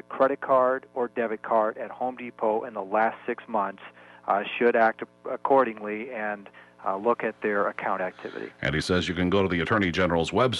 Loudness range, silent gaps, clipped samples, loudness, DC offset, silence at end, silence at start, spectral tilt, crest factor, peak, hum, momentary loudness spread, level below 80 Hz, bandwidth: 3 LU; none; under 0.1%; -26 LUFS; under 0.1%; 0 s; 0.1 s; -6 dB/octave; 16 dB; -10 dBFS; 60 Hz at -60 dBFS; 11 LU; -54 dBFS; 11.5 kHz